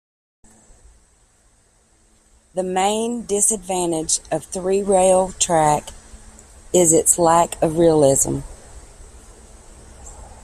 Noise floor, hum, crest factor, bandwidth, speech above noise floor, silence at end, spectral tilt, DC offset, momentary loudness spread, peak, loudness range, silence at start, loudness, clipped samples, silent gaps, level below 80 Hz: -57 dBFS; none; 20 dB; 15.5 kHz; 40 dB; 0.1 s; -4 dB/octave; under 0.1%; 12 LU; 0 dBFS; 7 LU; 2.55 s; -17 LUFS; under 0.1%; none; -44 dBFS